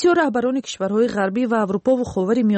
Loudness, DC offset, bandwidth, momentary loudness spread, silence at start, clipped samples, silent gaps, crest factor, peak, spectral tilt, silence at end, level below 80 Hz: -20 LUFS; under 0.1%; 8.6 kHz; 4 LU; 0 s; under 0.1%; none; 12 dB; -8 dBFS; -6 dB/octave; 0 s; -54 dBFS